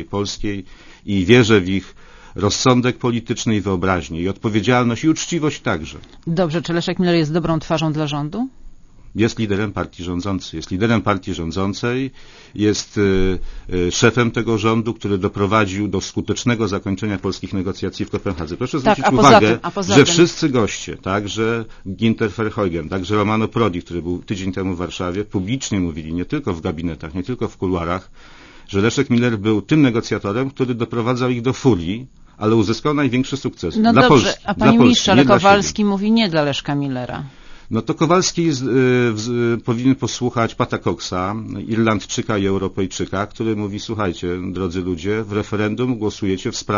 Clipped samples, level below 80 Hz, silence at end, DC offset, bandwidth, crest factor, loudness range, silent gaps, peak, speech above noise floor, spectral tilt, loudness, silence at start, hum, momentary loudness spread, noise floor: under 0.1%; -40 dBFS; 0 s; under 0.1%; 7.4 kHz; 18 dB; 7 LU; none; 0 dBFS; 21 dB; -5.5 dB/octave; -18 LUFS; 0 s; none; 12 LU; -39 dBFS